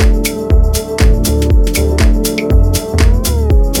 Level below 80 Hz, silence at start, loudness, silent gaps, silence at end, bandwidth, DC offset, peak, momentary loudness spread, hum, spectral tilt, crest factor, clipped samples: -12 dBFS; 0 s; -12 LUFS; none; 0 s; 17.5 kHz; under 0.1%; 0 dBFS; 2 LU; none; -5.5 dB/octave; 10 dB; under 0.1%